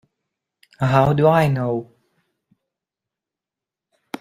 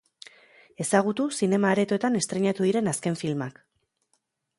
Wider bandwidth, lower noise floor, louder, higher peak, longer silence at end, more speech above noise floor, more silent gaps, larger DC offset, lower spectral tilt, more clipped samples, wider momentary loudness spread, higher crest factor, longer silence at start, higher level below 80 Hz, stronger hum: first, 15 kHz vs 11.5 kHz; first, -88 dBFS vs -74 dBFS; first, -18 LUFS vs -25 LUFS; first, -2 dBFS vs -6 dBFS; first, 2.35 s vs 1.1 s; first, 71 dB vs 49 dB; neither; neither; first, -8 dB/octave vs -5 dB/octave; neither; first, 12 LU vs 8 LU; about the same, 20 dB vs 20 dB; about the same, 0.8 s vs 0.8 s; first, -52 dBFS vs -70 dBFS; neither